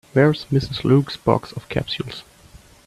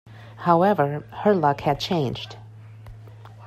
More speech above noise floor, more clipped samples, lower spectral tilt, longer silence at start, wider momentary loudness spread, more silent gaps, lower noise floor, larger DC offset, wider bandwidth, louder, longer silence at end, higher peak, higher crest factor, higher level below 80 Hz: first, 28 dB vs 21 dB; neither; about the same, -7.5 dB/octave vs -7 dB/octave; about the same, 0.15 s vs 0.05 s; second, 10 LU vs 25 LU; neither; first, -47 dBFS vs -43 dBFS; neither; second, 13 kHz vs 14.5 kHz; about the same, -20 LUFS vs -22 LUFS; first, 0.3 s vs 0 s; first, 0 dBFS vs -6 dBFS; about the same, 20 dB vs 18 dB; first, -46 dBFS vs -54 dBFS